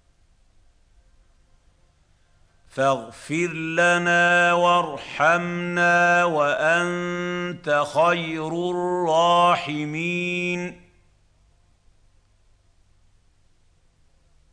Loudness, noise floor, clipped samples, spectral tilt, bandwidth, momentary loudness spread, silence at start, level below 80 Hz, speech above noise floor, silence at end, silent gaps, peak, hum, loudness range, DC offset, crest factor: -21 LUFS; -60 dBFS; under 0.1%; -4.5 dB/octave; 10.5 kHz; 10 LU; 2.75 s; -60 dBFS; 39 dB; 3.75 s; none; -6 dBFS; none; 11 LU; under 0.1%; 18 dB